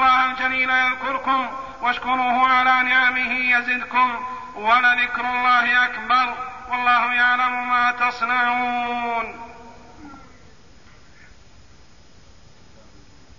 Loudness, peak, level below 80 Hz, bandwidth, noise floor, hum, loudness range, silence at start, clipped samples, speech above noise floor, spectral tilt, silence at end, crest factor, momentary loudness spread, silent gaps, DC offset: -19 LUFS; -6 dBFS; -54 dBFS; 7.4 kHz; -51 dBFS; none; 8 LU; 0 s; under 0.1%; 31 dB; -3 dB/octave; 3.2 s; 16 dB; 10 LU; none; 0.4%